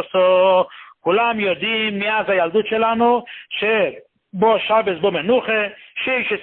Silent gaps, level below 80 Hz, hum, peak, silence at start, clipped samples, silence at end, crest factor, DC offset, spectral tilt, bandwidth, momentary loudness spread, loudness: none; -60 dBFS; none; -4 dBFS; 0 s; under 0.1%; 0 s; 14 dB; under 0.1%; -9.5 dB/octave; 4.2 kHz; 9 LU; -18 LUFS